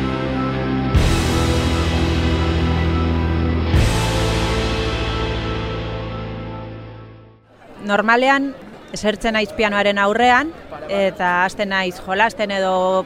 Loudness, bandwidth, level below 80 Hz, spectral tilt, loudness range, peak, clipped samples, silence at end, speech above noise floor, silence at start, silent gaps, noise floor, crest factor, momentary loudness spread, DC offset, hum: -19 LUFS; 15 kHz; -26 dBFS; -5.5 dB/octave; 5 LU; -2 dBFS; under 0.1%; 0 s; 28 dB; 0 s; none; -45 dBFS; 18 dB; 13 LU; under 0.1%; none